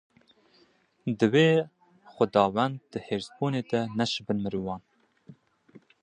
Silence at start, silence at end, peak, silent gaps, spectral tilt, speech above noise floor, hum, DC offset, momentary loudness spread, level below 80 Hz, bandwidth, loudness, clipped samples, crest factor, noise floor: 1.05 s; 0.25 s; -8 dBFS; none; -6.5 dB/octave; 38 dB; none; under 0.1%; 15 LU; -64 dBFS; 10 kHz; -27 LUFS; under 0.1%; 22 dB; -64 dBFS